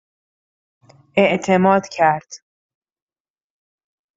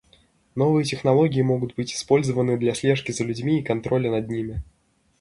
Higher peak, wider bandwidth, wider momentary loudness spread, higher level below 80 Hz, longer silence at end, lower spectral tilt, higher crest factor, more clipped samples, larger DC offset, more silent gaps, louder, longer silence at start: about the same, -2 dBFS vs -4 dBFS; second, 7.8 kHz vs 11.5 kHz; second, 6 LU vs 9 LU; second, -64 dBFS vs -48 dBFS; first, 1.8 s vs 0.6 s; about the same, -6 dB/octave vs -6 dB/octave; about the same, 20 dB vs 18 dB; neither; neither; neither; first, -17 LUFS vs -23 LUFS; first, 1.15 s vs 0.55 s